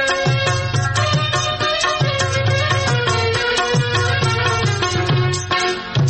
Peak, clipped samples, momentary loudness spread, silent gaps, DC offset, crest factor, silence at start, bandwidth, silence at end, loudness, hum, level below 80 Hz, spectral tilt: -6 dBFS; under 0.1%; 2 LU; none; under 0.1%; 12 dB; 0 s; 8.8 kHz; 0 s; -17 LUFS; none; -42 dBFS; -4 dB/octave